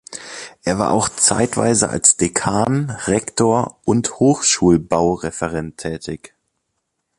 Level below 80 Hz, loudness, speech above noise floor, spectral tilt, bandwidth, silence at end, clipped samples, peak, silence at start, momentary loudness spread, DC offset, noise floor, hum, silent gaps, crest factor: -44 dBFS; -17 LUFS; 56 dB; -4 dB/octave; 11.5 kHz; 1.05 s; under 0.1%; 0 dBFS; 0.1 s; 14 LU; under 0.1%; -74 dBFS; none; none; 18 dB